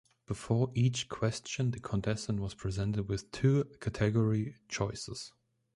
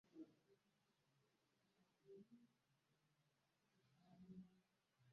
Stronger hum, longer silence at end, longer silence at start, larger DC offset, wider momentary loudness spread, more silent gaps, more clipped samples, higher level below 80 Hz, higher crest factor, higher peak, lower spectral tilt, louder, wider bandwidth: neither; first, 0.45 s vs 0 s; first, 0.3 s vs 0.05 s; neither; first, 11 LU vs 4 LU; neither; neither; first, -54 dBFS vs under -90 dBFS; about the same, 18 dB vs 20 dB; first, -16 dBFS vs -50 dBFS; second, -6 dB/octave vs -7.5 dB/octave; first, -33 LUFS vs -66 LUFS; first, 11.5 kHz vs 6.2 kHz